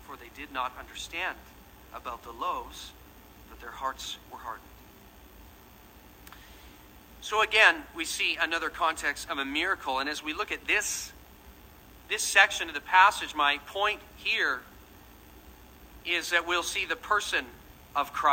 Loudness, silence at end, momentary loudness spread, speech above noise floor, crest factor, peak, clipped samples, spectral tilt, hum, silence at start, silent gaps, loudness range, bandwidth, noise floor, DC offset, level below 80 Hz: -27 LUFS; 0 s; 22 LU; 24 dB; 26 dB; -4 dBFS; under 0.1%; -1 dB/octave; none; 0 s; none; 16 LU; 16 kHz; -53 dBFS; under 0.1%; -56 dBFS